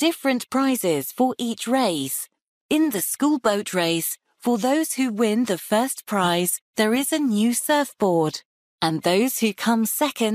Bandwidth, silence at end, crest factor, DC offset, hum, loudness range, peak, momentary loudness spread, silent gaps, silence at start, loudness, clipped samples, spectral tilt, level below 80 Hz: 15.5 kHz; 0 s; 16 dB; under 0.1%; none; 1 LU; -6 dBFS; 5 LU; 2.48-2.69 s, 6.62-6.73 s, 8.45-8.78 s; 0 s; -22 LUFS; under 0.1%; -4 dB/octave; -68 dBFS